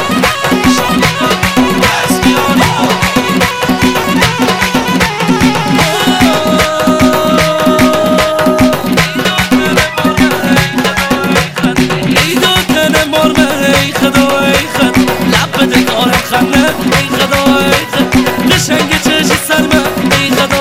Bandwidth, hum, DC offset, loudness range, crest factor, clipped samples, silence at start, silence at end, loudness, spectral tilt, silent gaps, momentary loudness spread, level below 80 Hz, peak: 16.5 kHz; none; under 0.1%; 1 LU; 10 dB; 0.7%; 0 s; 0 s; -9 LUFS; -4 dB/octave; none; 2 LU; -30 dBFS; 0 dBFS